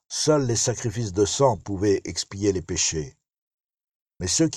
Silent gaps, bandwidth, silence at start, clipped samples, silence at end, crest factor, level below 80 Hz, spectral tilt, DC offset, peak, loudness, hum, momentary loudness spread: 3.38-3.78 s, 3.95-4.06 s; 13.5 kHz; 0.1 s; under 0.1%; 0 s; 18 dB; -50 dBFS; -4 dB/octave; under 0.1%; -8 dBFS; -24 LUFS; none; 9 LU